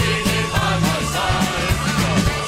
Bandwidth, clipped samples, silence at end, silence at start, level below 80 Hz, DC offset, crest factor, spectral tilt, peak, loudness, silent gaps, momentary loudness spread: 16 kHz; under 0.1%; 0 s; 0 s; -30 dBFS; under 0.1%; 14 dB; -4.5 dB/octave; -6 dBFS; -19 LUFS; none; 2 LU